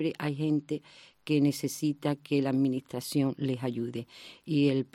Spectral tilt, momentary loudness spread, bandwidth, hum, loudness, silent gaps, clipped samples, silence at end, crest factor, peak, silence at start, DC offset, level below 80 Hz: -6.5 dB/octave; 11 LU; 16 kHz; none; -30 LUFS; none; under 0.1%; 0.1 s; 16 dB; -14 dBFS; 0 s; under 0.1%; -72 dBFS